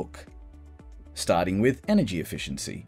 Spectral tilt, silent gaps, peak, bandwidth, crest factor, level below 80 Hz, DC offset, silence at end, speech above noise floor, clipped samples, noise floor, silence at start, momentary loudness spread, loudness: -5.5 dB/octave; none; -10 dBFS; 16 kHz; 18 dB; -48 dBFS; under 0.1%; 0 s; 20 dB; under 0.1%; -46 dBFS; 0 s; 17 LU; -26 LUFS